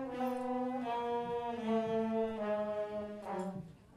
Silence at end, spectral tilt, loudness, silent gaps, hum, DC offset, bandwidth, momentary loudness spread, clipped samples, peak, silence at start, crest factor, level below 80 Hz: 0 s; -7 dB/octave; -37 LUFS; none; none; under 0.1%; 14.5 kHz; 7 LU; under 0.1%; -24 dBFS; 0 s; 14 dB; -70 dBFS